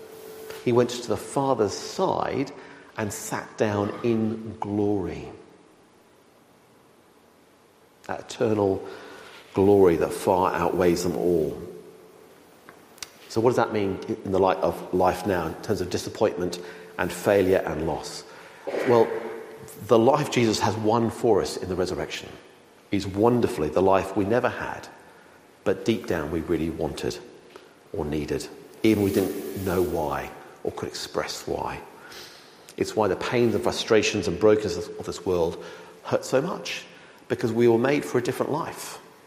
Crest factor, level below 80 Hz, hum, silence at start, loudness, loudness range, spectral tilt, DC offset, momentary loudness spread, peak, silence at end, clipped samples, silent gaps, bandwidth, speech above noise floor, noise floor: 20 dB; -52 dBFS; none; 0 s; -25 LUFS; 7 LU; -5.5 dB/octave; under 0.1%; 18 LU; -6 dBFS; 0.25 s; under 0.1%; none; 16 kHz; 32 dB; -57 dBFS